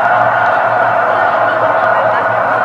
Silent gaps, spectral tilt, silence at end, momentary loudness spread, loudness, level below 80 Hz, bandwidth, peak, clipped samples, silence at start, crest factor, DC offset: none; -6 dB/octave; 0 s; 1 LU; -11 LUFS; -54 dBFS; 7.8 kHz; 0 dBFS; under 0.1%; 0 s; 12 dB; under 0.1%